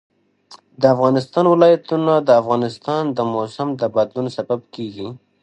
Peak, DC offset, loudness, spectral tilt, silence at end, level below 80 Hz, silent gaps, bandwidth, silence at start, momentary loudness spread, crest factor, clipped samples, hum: 0 dBFS; under 0.1%; -17 LUFS; -7.5 dB/octave; 0.25 s; -64 dBFS; none; 8.8 kHz; 0.5 s; 13 LU; 18 dB; under 0.1%; none